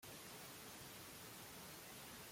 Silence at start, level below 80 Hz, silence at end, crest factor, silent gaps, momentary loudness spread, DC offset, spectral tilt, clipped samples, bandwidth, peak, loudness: 0 s; -78 dBFS; 0 s; 14 dB; none; 0 LU; under 0.1%; -2.5 dB/octave; under 0.1%; 16.5 kHz; -42 dBFS; -54 LUFS